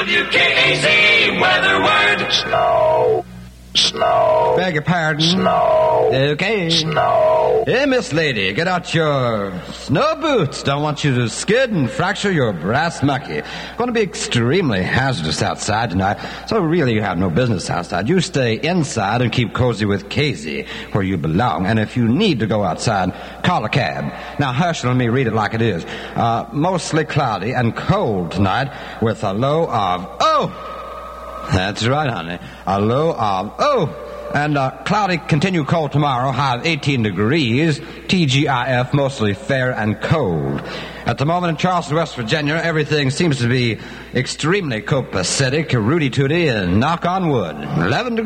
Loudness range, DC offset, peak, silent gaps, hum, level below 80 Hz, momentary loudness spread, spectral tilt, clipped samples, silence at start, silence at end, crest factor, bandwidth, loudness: 4 LU; under 0.1%; -2 dBFS; none; none; -44 dBFS; 8 LU; -5 dB/octave; under 0.1%; 0 s; 0 s; 16 dB; 12 kHz; -17 LUFS